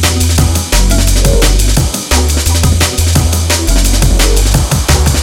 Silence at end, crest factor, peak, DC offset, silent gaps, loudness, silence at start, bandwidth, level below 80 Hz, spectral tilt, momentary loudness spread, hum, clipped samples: 0 s; 8 dB; 0 dBFS; under 0.1%; none; -10 LUFS; 0 s; 17 kHz; -12 dBFS; -4 dB/octave; 2 LU; none; 0.2%